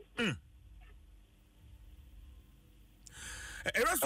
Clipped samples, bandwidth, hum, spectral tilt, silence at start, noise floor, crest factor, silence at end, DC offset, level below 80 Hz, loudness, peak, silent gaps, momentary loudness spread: under 0.1%; 16 kHz; none; -3 dB/octave; 0 s; -61 dBFS; 20 dB; 0 s; under 0.1%; -56 dBFS; -37 LUFS; -20 dBFS; none; 26 LU